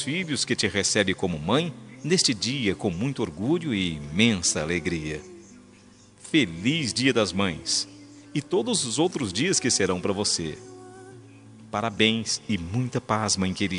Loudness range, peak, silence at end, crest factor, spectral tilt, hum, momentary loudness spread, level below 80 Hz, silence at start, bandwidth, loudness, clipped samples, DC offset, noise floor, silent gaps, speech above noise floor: 2 LU; -4 dBFS; 0 s; 22 dB; -3.5 dB/octave; none; 11 LU; -56 dBFS; 0 s; 11 kHz; -25 LUFS; under 0.1%; under 0.1%; -52 dBFS; none; 27 dB